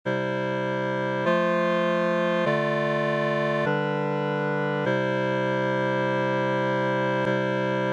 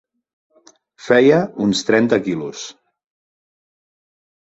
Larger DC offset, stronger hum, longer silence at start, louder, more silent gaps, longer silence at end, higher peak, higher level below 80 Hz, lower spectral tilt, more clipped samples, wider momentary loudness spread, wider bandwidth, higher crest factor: neither; neither; second, 0.05 s vs 1.05 s; second, -25 LUFS vs -16 LUFS; neither; second, 0 s vs 1.8 s; second, -12 dBFS vs -2 dBFS; second, -74 dBFS vs -58 dBFS; first, -7 dB/octave vs -5 dB/octave; neither; second, 3 LU vs 17 LU; first, 9.2 kHz vs 8 kHz; second, 12 dB vs 18 dB